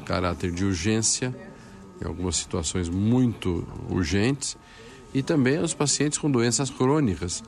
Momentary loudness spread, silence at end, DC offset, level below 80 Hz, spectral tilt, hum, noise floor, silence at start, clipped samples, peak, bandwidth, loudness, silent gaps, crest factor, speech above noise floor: 10 LU; 0 s; under 0.1%; -46 dBFS; -4.5 dB/octave; none; -45 dBFS; 0 s; under 0.1%; -10 dBFS; 12.5 kHz; -25 LUFS; none; 14 dB; 20 dB